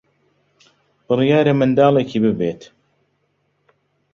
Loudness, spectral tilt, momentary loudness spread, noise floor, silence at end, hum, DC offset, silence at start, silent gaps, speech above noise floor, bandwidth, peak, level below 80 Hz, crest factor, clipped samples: -16 LUFS; -8 dB/octave; 10 LU; -67 dBFS; 1.5 s; none; under 0.1%; 1.1 s; none; 51 dB; 7.2 kHz; -2 dBFS; -58 dBFS; 18 dB; under 0.1%